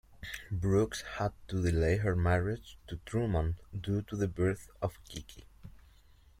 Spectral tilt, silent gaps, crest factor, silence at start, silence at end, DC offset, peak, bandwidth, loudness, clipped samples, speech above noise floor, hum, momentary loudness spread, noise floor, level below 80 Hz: -6.5 dB/octave; none; 18 dB; 0.1 s; 0.7 s; under 0.1%; -16 dBFS; 15.5 kHz; -33 LUFS; under 0.1%; 28 dB; none; 16 LU; -60 dBFS; -48 dBFS